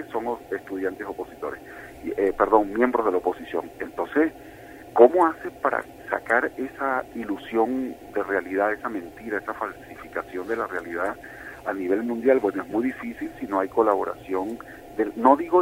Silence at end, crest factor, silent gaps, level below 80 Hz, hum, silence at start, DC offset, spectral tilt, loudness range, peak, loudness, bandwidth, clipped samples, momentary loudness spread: 0 s; 24 dB; none; -56 dBFS; none; 0 s; under 0.1%; -6.5 dB/octave; 6 LU; -2 dBFS; -25 LUFS; 16 kHz; under 0.1%; 14 LU